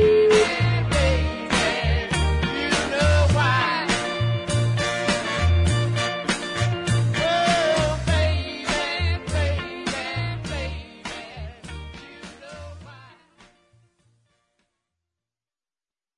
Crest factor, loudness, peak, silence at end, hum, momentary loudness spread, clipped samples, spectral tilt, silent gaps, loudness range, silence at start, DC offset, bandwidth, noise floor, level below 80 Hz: 18 dB; -22 LUFS; -6 dBFS; 3.1 s; none; 18 LU; under 0.1%; -5 dB/octave; none; 16 LU; 0 s; under 0.1%; 11 kHz; under -90 dBFS; -34 dBFS